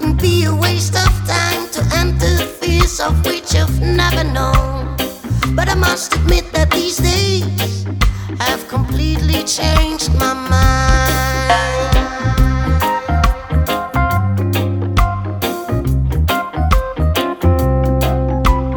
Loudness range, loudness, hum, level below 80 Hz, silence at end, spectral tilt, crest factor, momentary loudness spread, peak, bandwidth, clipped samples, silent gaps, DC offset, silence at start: 2 LU; -15 LUFS; none; -18 dBFS; 0 s; -5 dB/octave; 14 dB; 4 LU; 0 dBFS; 19.5 kHz; under 0.1%; none; under 0.1%; 0 s